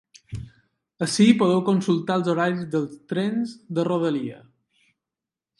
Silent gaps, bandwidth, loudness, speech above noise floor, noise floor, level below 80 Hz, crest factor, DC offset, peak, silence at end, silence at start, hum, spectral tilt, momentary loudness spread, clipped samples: none; 11.5 kHz; -23 LUFS; 66 dB; -88 dBFS; -56 dBFS; 22 dB; under 0.1%; -2 dBFS; 1.25 s; 0.3 s; none; -6 dB/octave; 18 LU; under 0.1%